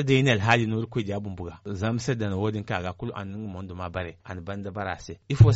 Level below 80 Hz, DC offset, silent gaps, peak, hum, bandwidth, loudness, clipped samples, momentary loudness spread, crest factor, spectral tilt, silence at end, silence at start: -46 dBFS; under 0.1%; none; -6 dBFS; none; 8 kHz; -28 LUFS; under 0.1%; 15 LU; 20 dB; -5.5 dB/octave; 0 s; 0 s